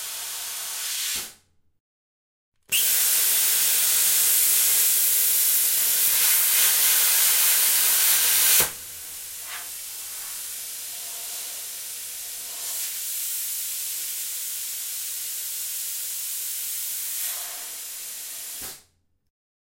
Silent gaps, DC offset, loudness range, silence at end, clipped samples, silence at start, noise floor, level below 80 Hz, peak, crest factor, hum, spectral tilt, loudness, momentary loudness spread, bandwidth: 1.80-2.52 s; under 0.1%; 13 LU; 0.9 s; under 0.1%; 0 s; -63 dBFS; -68 dBFS; -4 dBFS; 20 dB; none; 3 dB/octave; -20 LUFS; 16 LU; 16.5 kHz